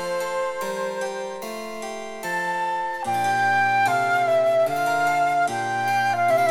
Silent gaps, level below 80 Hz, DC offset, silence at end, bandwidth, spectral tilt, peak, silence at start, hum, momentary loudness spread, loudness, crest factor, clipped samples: none; -64 dBFS; under 0.1%; 0 s; 17 kHz; -3.5 dB/octave; -10 dBFS; 0 s; none; 12 LU; -23 LUFS; 12 dB; under 0.1%